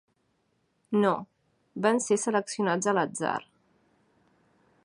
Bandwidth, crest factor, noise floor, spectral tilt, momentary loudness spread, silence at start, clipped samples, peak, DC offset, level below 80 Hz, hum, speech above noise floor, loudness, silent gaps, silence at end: 11 kHz; 20 dB; -73 dBFS; -4.5 dB/octave; 7 LU; 0.9 s; under 0.1%; -10 dBFS; under 0.1%; -76 dBFS; none; 46 dB; -28 LUFS; none; 1.45 s